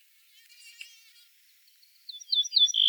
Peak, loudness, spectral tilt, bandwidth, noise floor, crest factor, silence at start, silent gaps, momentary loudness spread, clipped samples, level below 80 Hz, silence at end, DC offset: -10 dBFS; -23 LUFS; 12 dB/octave; over 20 kHz; -61 dBFS; 20 dB; 0.8 s; none; 26 LU; under 0.1%; under -90 dBFS; 0 s; under 0.1%